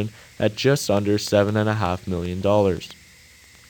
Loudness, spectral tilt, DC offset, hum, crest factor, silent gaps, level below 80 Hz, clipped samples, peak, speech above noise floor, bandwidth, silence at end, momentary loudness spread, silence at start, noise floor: -22 LUFS; -5.5 dB/octave; under 0.1%; none; 18 dB; none; -50 dBFS; under 0.1%; -4 dBFS; 28 dB; 19 kHz; 0.75 s; 9 LU; 0 s; -49 dBFS